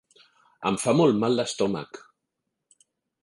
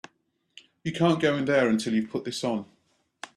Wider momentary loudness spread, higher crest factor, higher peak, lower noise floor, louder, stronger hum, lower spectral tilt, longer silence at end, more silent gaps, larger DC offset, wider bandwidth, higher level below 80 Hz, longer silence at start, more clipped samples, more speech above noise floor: first, 17 LU vs 12 LU; about the same, 18 dB vs 18 dB; about the same, -8 dBFS vs -10 dBFS; first, -82 dBFS vs -72 dBFS; about the same, -24 LUFS vs -26 LUFS; neither; about the same, -5.5 dB/octave vs -5.5 dB/octave; first, 1.25 s vs 0.1 s; neither; neither; second, 11.5 kHz vs 13 kHz; about the same, -66 dBFS vs -66 dBFS; second, 0.6 s vs 0.85 s; neither; first, 58 dB vs 47 dB